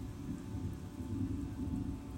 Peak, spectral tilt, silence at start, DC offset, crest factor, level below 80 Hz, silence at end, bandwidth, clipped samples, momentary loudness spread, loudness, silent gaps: -26 dBFS; -8 dB/octave; 0 s; under 0.1%; 14 dB; -50 dBFS; 0 s; 16 kHz; under 0.1%; 5 LU; -41 LUFS; none